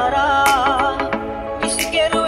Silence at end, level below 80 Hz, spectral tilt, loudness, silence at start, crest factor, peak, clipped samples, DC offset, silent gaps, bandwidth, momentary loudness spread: 0 s; -38 dBFS; -2.5 dB/octave; -17 LUFS; 0 s; 16 dB; -2 dBFS; under 0.1%; under 0.1%; none; 16 kHz; 9 LU